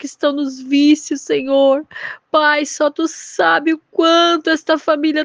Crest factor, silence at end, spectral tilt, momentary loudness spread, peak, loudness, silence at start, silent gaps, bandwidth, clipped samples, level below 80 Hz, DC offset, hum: 14 dB; 0 s; -2 dB/octave; 8 LU; -2 dBFS; -15 LUFS; 0 s; none; 9.8 kHz; under 0.1%; -68 dBFS; under 0.1%; none